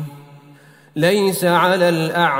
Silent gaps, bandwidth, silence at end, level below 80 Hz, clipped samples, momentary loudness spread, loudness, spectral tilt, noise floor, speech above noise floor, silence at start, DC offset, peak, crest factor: none; 16.5 kHz; 0 s; -64 dBFS; under 0.1%; 12 LU; -16 LUFS; -5 dB/octave; -46 dBFS; 31 dB; 0 s; under 0.1%; -2 dBFS; 16 dB